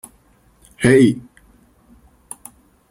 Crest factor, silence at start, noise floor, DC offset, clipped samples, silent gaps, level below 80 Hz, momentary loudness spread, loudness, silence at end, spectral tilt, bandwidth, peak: 20 dB; 0.8 s; -55 dBFS; under 0.1%; under 0.1%; none; -50 dBFS; 24 LU; -15 LUFS; 1.7 s; -6 dB/octave; 16.5 kHz; -2 dBFS